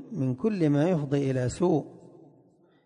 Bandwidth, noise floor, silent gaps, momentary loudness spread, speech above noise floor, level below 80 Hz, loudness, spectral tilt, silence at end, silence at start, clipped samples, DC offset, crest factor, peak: 10.5 kHz; -61 dBFS; none; 6 LU; 35 dB; -56 dBFS; -27 LUFS; -8 dB/octave; 0.9 s; 0 s; under 0.1%; under 0.1%; 14 dB; -14 dBFS